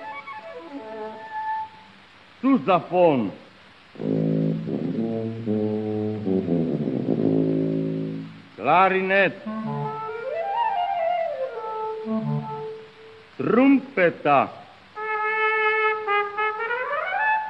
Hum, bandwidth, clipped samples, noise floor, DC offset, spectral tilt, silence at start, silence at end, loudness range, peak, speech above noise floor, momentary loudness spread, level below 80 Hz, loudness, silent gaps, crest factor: none; 5.8 kHz; under 0.1%; -50 dBFS; under 0.1%; -8.5 dB/octave; 0 s; 0 s; 5 LU; -4 dBFS; 31 dB; 16 LU; -66 dBFS; -23 LUFS; none; 20 dB